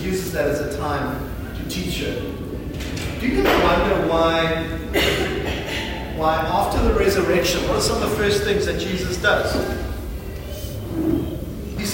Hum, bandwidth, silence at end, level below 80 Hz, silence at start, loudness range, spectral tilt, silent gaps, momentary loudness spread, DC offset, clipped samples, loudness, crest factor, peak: none; 16.5 kHz; 0 s; -32 dBFS; 0 s; 4 LU; -4.5 dB/octave; none; 12 LU; under 0.1%; under 0.1%; -21 LUFS; 18 dB; -4 dBFS